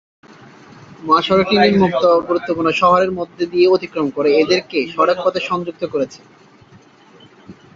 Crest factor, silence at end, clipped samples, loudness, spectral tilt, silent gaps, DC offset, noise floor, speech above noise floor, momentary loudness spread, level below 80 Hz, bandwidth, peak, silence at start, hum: 16 dB; 0.25 s; under 0.1%; -16 LUFS; -6 dB/octave; none; under 0.1%; -46 dBFS; 31 dB; 9 LU; -54 dBFS; 7.4 kHz; -2 dBFS; 1 s; none